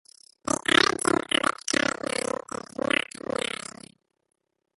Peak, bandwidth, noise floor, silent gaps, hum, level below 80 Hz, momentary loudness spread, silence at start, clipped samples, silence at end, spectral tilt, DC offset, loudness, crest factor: -2 dBFS; 12 kHz; -53 dBFS; none; none; -60 dBFS; 15 LU; 0.45 s; under 0.1%; 2.85 s; -2 dB/octave; under 0.1%; -25 LUFS; 26 dB